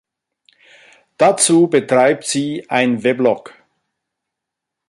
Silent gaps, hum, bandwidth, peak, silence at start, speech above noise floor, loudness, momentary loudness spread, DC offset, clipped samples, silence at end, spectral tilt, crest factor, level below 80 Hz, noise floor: none; none; 11.5 kHz; 0 dBFS; 1.2 s; 67 dB; -15 LUFS; 8 LU; under 0.1%; under 0.1%; 1.5 s; -4 dB/octave; 18 dB; -64 dBFS; -81 dBFS